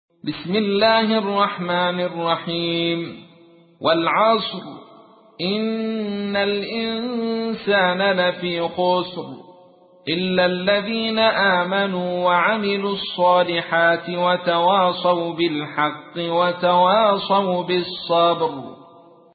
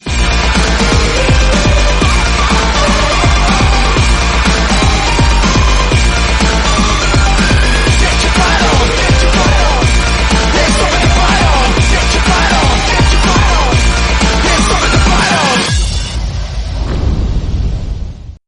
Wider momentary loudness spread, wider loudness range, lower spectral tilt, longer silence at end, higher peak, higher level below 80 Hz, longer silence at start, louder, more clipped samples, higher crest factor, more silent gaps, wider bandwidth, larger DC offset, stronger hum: about the same, 8 LU vs 7 LU; about the same, 4 LU vs 2 LU; first, -10 dB/octave vs -4 dB/octave; first, 0.5 s vs 0.15 s; second, -4 dBFS vs 0 dBFS; second, -62 dBFS vs -12 dBFS; first, 0.25 s vs 0.05 s; second, -20 LUFS vs -10 LUFS; neither; first, 16 dB vs 10 dB; neither; second, 4.8 kHz vs 11 kHz; neither; neither